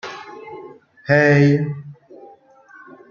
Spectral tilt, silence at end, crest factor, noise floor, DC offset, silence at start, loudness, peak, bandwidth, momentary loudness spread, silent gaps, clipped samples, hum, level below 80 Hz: -8 dB/octave; 1.2 s; 18 dB; -47 dBFS; under 0.1%; 0.05 s; -16 LUFS; -2 dBFS; 7 kHz; 24 LU; none; under 0.1%; none; -62 dBFS